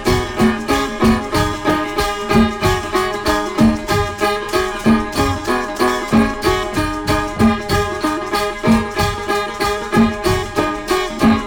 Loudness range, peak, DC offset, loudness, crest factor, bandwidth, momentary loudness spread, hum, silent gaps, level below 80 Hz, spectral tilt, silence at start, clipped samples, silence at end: 1 LU; 0 dBFS; under 0.1%; -17 LUFS; 16 dB; over 20 kHz; 4 LU; none; none; -30 dBFS; -5 dB/octave; 0 s; under 0.1%; 0 s